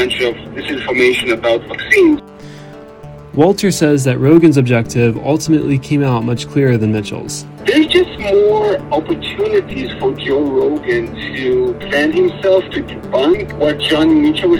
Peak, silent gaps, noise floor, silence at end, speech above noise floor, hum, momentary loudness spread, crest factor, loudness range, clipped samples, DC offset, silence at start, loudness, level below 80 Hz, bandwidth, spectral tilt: 0 dBFS; none; -34 dBFS; 0 s; 20 dB; none; 12 LU; 14 dB; 3 LU; 0.1%; under 0.1%; 0 s; -14 LUFS; -42 dBFS; 16.5 kHz; -6 dB/octave